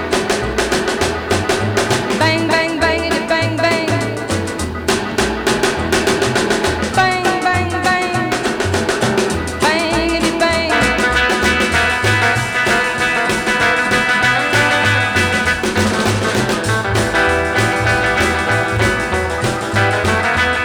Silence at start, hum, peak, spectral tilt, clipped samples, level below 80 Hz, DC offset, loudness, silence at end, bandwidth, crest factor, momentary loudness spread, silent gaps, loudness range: 0 s; none; -2 dBFS; -4 dB/octave; under 0.1%; -34 dBFS; under 0.1%; -15 LUFS; 0 s; over 20 kHz; 12 dB; 4 LU; none; 3 LU